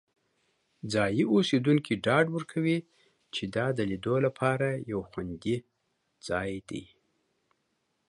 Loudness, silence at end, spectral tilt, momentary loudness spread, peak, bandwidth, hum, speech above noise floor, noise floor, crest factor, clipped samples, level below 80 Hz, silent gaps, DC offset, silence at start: -29 LUFS; 1.25 s; -6.5 dB/octave; 13 LU; -10 dBFS; 11.5 kHz; none; 49 dB; -77 dBFS; 20 dB; under 0.1%; -60 dBFS; none; under 0.1%; 0.85 s